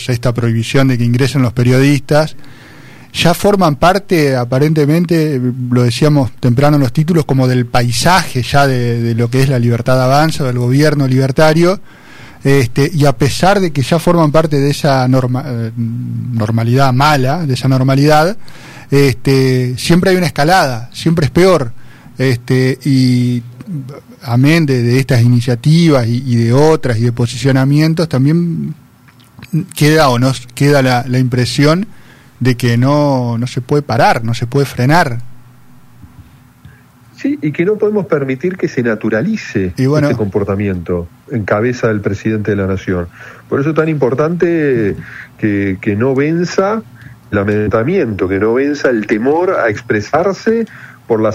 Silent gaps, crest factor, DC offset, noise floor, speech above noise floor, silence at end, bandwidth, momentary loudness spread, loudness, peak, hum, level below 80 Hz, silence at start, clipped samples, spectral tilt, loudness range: none; 12 dB; under 0.1%; -43 dBFS; 32 dB; 0 s; 15.5 kHz; 8 LU; -13 LUFS; 0 dBFS; none; -38 dBFS; 0 s; under 0.1%; -6.5 dB/octave; 4 LU